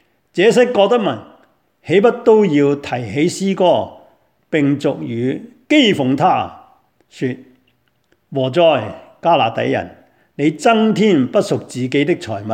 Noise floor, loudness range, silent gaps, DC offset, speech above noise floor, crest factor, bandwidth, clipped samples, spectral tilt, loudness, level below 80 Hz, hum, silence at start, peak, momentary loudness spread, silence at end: -62 dBFS; 4 LU; none; under 0.1%; 47 dB; 16 dB; 14.5 kHz; under 0.1%; -6 dB/octave; -16 LUFS; -60 dBFS; none; 0.35 s; 0 dBFS; 12 LU; 0 s